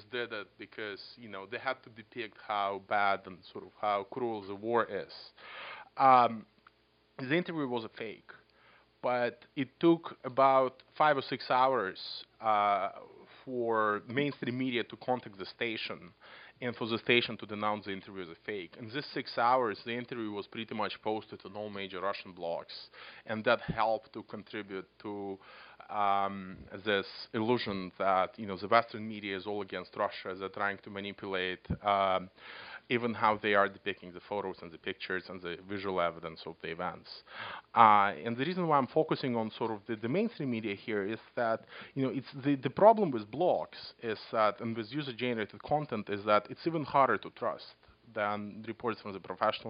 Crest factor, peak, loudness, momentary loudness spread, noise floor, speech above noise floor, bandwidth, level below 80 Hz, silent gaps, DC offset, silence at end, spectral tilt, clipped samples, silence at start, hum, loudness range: 26 dB; -8 dBFS; -33 LUFS; 16 LU; -69 dBFS; 36 dB; 5.2 kHz; -68 dBFS; none; under 0.1%; 0 s; -3.5 dB/octave; under 0.1%; 0 s; none; 7 LU